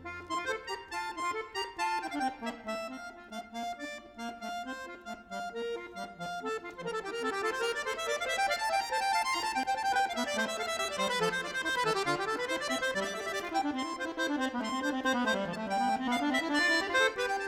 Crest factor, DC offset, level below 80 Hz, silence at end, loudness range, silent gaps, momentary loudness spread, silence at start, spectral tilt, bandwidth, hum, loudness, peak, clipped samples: 18 dB; under 0.1%; -66 dBFS; 0 s; 9 LU; none; 11 LU; 0 s; -2.5 dB/octave; 17 kHz; none; -33 LUFS; -16 dBFS; under 0.1%